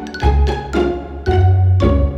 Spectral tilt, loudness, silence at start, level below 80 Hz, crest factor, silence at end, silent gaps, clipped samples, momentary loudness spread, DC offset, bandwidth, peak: -8 dB/octave; -16 LUFS; 0 s; -20 dBFS; 12 dB; 0 s; none; under 0.1%; 6 LU; under 0.1%; 7.6 kHz; -2 dBFS